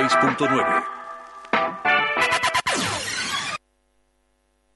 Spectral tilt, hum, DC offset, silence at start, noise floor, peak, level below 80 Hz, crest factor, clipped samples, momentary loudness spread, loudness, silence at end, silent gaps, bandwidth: -2.5 dB/octave; none; under 0.1%; 0 s; -67 dBFS; -6 dBFS; -58 dBFS; 18 dB; under 0.1%; 15 LU; -21 LUFS; 1.2 s; none; 11.5 kHz